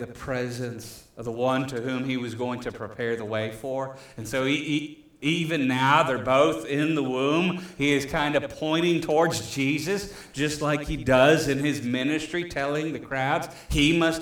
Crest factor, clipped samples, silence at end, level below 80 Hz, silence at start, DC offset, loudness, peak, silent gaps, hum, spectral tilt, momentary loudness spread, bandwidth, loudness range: 18 dB; under 0.1%; 0 s; -46 dBFS; 0 s; under 0.1%; -25 LUFS; -6 dBFS; none; none; -5 dB/octave; 11 LU; 18.5 kHz; 6 LU